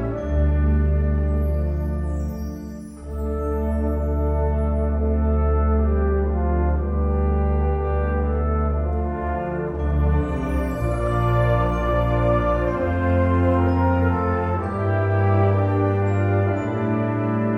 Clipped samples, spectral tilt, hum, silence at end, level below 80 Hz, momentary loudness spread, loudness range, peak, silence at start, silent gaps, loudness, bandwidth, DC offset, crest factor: under 0.1%; -9.5 dB/octave; none; 0 s; -24 dBFS; 6 LU; 4 LU; -8 dBFS; 0 s; none; -22 LUFS; 3.8 kHz; under 0.1%; 12 dB